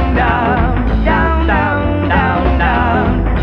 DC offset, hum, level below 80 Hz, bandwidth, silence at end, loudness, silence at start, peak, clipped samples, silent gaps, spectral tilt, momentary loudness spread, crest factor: under 0.1%; none; -18 dBFS; 5.6 kHz; 0 s; -13 LUFS; 0 s; 0 dBFS; under 0.1%; none; -9 dB/octave; 2 LU; 12 dB